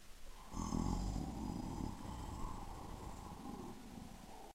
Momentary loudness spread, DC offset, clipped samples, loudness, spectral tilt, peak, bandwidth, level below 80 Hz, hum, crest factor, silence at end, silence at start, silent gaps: 12 LU; under 0.1%; under 0.1%; -47 LUFS; -6 dB/octave; -26 dBFS; 16 kHz; -50 dBFS; none; 20 dB; 0 s; 0 s; none